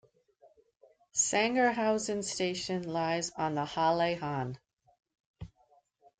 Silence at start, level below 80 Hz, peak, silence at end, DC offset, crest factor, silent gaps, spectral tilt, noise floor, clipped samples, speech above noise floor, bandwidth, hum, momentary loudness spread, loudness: 1.15 s; -66 dBFS; -14 dBFS; 0.75 s; under 0.1%; 18 dB; 4.73-4.77 s, 5.20-5.34 s; -3.5 dB/octave; -68 dBFS; under 0.1%; 37 dB; 10 kHz; none; 21 LU; -31 LUFS